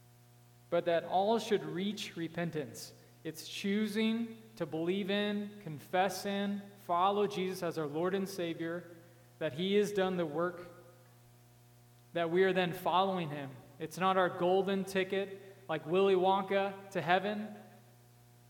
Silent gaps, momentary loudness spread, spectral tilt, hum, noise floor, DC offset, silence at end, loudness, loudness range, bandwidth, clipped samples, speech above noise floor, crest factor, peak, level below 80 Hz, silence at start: none; 14 LU; -5.5 dB/octave; 60 Hz at -60 dBFS; -61 dBFS; under 0.1%; 0.7 s; -34 LUFS; 4 LU; 18.5 kHz; under 0.1%; 28 dB; 22 dB; -12 dBFS; -78 dBFS; 0.7 s